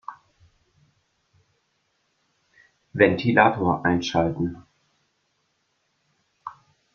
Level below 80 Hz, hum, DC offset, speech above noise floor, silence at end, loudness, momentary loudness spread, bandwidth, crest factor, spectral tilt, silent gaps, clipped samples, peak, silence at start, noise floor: -58 dBFS; none; under 0.1%; 51 dB; 0.45 s; -21 LUFS; 23 LU; 7 kHz; 24 dB; -6.5 dB/octave; none; under 0.1%; -2 dBFS; 0.1 s; -72 dBFS